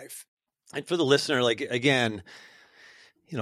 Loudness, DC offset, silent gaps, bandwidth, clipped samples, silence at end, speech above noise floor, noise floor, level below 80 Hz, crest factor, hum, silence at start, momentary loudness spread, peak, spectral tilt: -25 LUFS; under 0.1%; 0.28-0.37 s; 14.5 kHz; under 0.1%; 0 s; 29 dB; -55 dBFS; -70 dBFS; 22 dB; none; 0 s; 18 LU; -8 dBFS; -4.5 dB/octave